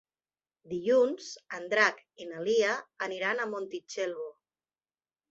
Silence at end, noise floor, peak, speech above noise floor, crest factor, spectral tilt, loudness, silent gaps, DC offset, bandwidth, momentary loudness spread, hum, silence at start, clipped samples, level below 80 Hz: 1 s; under -90 dBFS; -10 dBFS; over 60 dB; 22 dB; -3 dB/octave; -30 LUFS; none; under 0.1%; 8 kHz; 15 LU; none; 0.65 s; under 0.1%; -78 dBFS